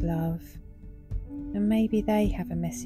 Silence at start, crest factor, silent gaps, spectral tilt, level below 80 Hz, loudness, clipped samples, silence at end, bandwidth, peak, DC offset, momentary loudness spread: 0 s; 14 dB; none; -7 dB/octave; -38 dBFS; -28 LUFS; under 0.1%; 0 s; 15 kHz; -14 dBFS; under 0.1%; 22 LU